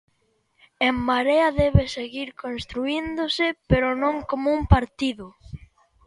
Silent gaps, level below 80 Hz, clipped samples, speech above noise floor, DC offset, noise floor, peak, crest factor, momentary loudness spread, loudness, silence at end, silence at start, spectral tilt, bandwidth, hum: none; -34 dBFS; under 0.1%; 46 dB; under 0.1%; -68 dBFS; -2 dBFS; 22 dB; 13 LU; -23 LUFS; 0.5 s; 0.8 s; -6.5 dB/octave; 11.5 kHz; none